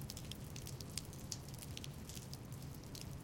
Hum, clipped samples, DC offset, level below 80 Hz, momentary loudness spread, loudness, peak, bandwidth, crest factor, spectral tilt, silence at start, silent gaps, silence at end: none; under 0.1%; under 0.1%; -60 dBFS; 3 LU; -49 LUFS; -20 dBFS; 17 kHz; 30 dB; -4 dB/octave; 0 s; none; 0 s